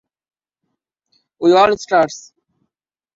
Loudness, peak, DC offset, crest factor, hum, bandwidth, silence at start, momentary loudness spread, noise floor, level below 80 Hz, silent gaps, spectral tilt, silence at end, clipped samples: -15 LUFS; -2 dBFS; under 0.1%; 18 dB; none; 7.8 kHz; 1.4 s; 9 LU; -83 dBFS; -58 dBFS; none; -4.5 dB/octave; 0.95 s; under 0.1%